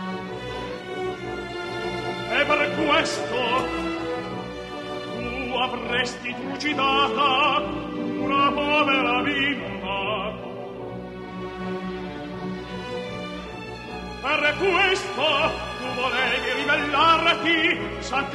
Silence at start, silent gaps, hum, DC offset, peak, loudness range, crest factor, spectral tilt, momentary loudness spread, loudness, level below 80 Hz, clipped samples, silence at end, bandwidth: 0 s; none; none; under 0.1%; -6 dBFS; 10 LU; 18 dB; -4 dB/octave; 14 LU; -23 LUFS; -48 dBFS; under 0.1%; 0 s; 12.5 kHz